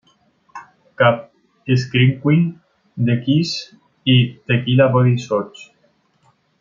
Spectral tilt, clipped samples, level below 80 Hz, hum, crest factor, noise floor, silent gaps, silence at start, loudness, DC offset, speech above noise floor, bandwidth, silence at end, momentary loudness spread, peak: -7 dB/octave; under 0.1%; -58 dBFS; none; 16 dB; -60 dBFS; none; 0.55 s; -17 LUFS; under 0.1%; 44 dB; 7.4 kHz; 0.95 s; 12 LU; -2 dBFS